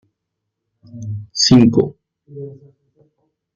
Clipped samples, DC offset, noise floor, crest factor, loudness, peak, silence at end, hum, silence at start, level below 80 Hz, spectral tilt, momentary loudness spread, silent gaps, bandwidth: under 0.1%; under 0.1%; -78 dBFS; 18 dB; -14 LUFS; -2 dBFS; 1 s; none; 0.95 s; -50 dBFS; -5 dB/octave; 24 LU; none; 7.4 kHz